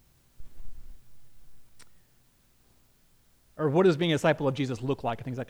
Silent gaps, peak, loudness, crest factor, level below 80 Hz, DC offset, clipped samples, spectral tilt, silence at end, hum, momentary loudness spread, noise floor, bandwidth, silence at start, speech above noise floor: none; -10 dBFS; -27 LUFS; 20 dB; -52 dBFS; under 0.1%; under 0.1%; -6.5 dB/octave; 0.05 s; none; 9 LU; -64 dBFS; over 20 kHz; 0.4 s; 38 dB